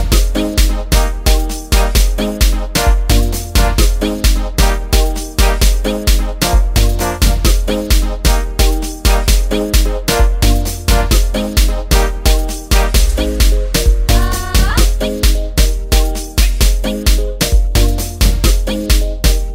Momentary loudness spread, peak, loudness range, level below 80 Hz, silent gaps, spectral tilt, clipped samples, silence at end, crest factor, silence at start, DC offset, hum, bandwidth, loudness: 3 LU; 0 dBFS; 1 LU; -12 dBFS; none; -4 dB/octave; under 0.1%; 0 s; 12 dB; 0 s; under 0.1%; none; 16.5 kHz; -14 LUFS